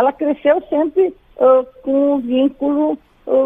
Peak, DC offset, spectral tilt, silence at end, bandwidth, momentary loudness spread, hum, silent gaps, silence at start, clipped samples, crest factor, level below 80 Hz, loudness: -2 dBFS; under 0.1%; -7.5 dB/octave; 0 s; 3.8 kHz; 7 LU; none; none; 0 s; under 0.1%; 14 dB; -54 dBFS; -16 LUFS